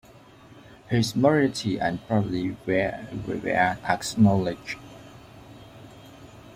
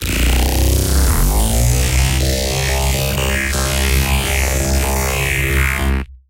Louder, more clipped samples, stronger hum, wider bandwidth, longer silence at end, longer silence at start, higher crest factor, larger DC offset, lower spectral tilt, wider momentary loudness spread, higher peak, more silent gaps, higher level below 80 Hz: second, -25 LUFS vs -16 LUFS; neither; neither; about the same, 16 kHz vs 17 kHz; second, 0 s vs 0.15 s; first, 0.55 s vs 0 s; first, 20 dB vs 12 dB; neither; first, -6 dB/octave vs -4 dB/octave; first, 25 LU vs 2 LU; second, -6 dBFS vs -2 dBFS; neither; second, -54 dBFS vs -18 dBFS